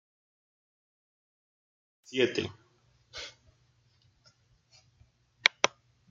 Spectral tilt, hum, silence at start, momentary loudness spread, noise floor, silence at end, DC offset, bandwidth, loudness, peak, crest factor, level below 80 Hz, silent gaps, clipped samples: -2.5 dB/octave; none; 2.1 s; 19 LU; -68 dBFS; 0.45 s; under 0.1%; 8.2 kHz; -30 LUFS; -2 dBFS; 36 dB; -74 dBFS; none; under 0.1%